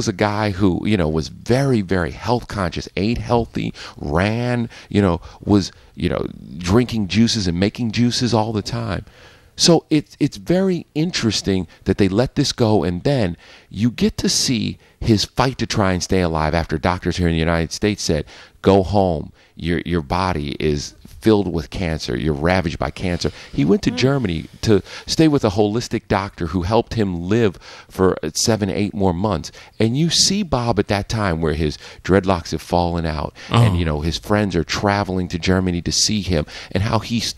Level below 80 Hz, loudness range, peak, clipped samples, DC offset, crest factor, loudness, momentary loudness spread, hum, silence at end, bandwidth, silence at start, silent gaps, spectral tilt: -36 dBFS; 2 LU; 0 dBFS; under 0.1%; under 0.1%; 18 dB; -19 LUFS; 8 LU; none; 0.05 s; 13.5 kHz; 0 s; none; -5 dB/octave